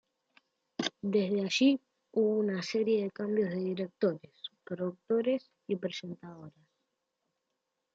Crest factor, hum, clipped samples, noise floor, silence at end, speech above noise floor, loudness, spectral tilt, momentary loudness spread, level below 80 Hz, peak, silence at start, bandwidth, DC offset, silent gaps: 18 dB; none; under 0.1%; -84 dBFS; 1.45 s; 53 dB; -32 LUFS; -5.5 dB/octave; 17 LU; -82 dBFS; -16 dBFS; 0.8 s; 7.8 kHz; under 0.1%; none